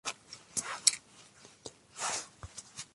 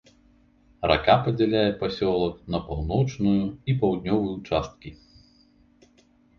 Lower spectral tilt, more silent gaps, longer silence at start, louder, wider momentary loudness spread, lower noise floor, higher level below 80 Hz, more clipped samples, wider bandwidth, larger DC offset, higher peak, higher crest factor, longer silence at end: second, 0.5 dB/octave vs -7.5 dB/octave; neither; second, 0.05 s vs 0.8 s; second, -32 LUFS vs -24 LUFS; first, 22 LU vs 9 LU; about the same, -58 dBFS vs -60 dBFS; second, -66 dBFS vs -44 dBFS; neither; first, 12 kHz vs 7 kHz; neither; about the same, -6 dBFS vs -4 dBFS; first, 34 dB vs 22 dB; second, 0.1 s vs 1.45 s